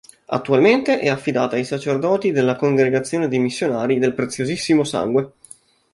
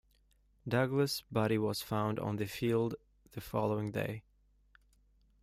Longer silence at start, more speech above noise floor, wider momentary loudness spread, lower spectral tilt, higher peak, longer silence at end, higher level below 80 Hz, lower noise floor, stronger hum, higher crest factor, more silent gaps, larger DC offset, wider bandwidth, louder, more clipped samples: second, 0.3 s vs 0.65 s; second, 29 dB vs 36 dB; second, 8 LU vs 16 LU; about the same, -5.5 dB/octave vs -6 dB/octave; first, -2 dBFS vs -18 dBFS; second, 0.65 s vs 1.2 s; about the same, -60 dBFS vs -64 dBFS; second, -47 dBFS vs -70 dBFS; second, none vs 50 Hz at -65 dBFS; about the same, 18 dB vs 18 dB; neither; neither; second, 11.5 kHz vs 16 kHz; first, -19 LUFS vs -35 LUFS; neither